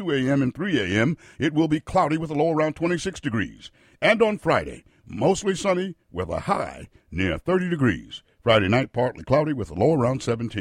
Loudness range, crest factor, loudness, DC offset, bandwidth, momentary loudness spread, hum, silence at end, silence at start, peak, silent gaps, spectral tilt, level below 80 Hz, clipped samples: 3 LU; 18 dB; -23 LUFS; under 0.1%; 12 kHz; 10 LU; none; 0 s; 0 s; -6 dBFS; none; -6 dB/octave; -48 dBFS; under 0.1%